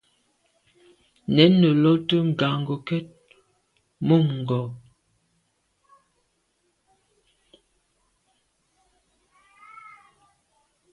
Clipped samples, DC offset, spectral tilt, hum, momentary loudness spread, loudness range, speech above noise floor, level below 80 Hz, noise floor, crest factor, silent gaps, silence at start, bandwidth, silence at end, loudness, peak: under 0.1%; under 0.1%; -8.5 dB/octave; none; 26 LU; 9 LU; 51 dB; -64 dBFS; -71 dBFS; 24 dB; none; 1.3 s; 6.4 kHz; 6.15 s; -21 LUFS; -2 dBFS